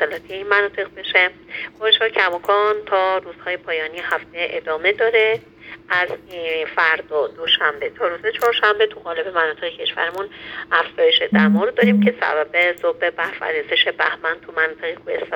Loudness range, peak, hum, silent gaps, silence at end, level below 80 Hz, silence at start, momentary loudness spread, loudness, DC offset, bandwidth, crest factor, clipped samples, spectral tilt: 3 LU; -2 dBFS; none; none; 0 s; -60 dBFS; 0 s; 11 LU; -19 LUFS; under 0.1%; 18 kHz; 18 dB; under 0.1%; -5.5 dB/octave